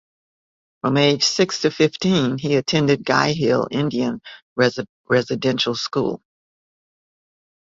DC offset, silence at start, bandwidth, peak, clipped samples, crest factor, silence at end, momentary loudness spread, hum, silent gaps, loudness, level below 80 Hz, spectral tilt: under 0.1%; 0.85 s; 7.8 kHz; -2 dBFS; under 0.1%; 20 dB; 1.5 s; 9 LU; none; 4.42-4.56 s, 4.89-5.04 s; -19 LUFS; -58 dBFS; -5 dB/octave